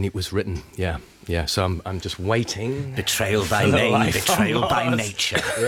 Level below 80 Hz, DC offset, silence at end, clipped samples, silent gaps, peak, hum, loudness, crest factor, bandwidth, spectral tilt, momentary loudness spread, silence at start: -44 dBFS; under 0.1%; 0 s; under 0.1%; none; -4 dBFS; none; -22 LUFS; 18 dB; 19 kHz; -4 dB/octave; 10 LU; 0 s